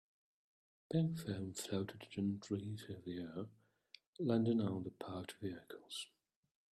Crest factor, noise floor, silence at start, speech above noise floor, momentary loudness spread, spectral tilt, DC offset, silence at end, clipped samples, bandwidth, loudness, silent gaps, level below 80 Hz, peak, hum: 20 dB; -67 dBFS; 0.9 s; 26 dB; 12 LU; -6.5 dB/octave; under 0.1%; 0.65 s; under 0.1%; 14.5 kHz; -42 LUFS; 4.07-4.13 s; -78 dBFS; -22 dBFS; none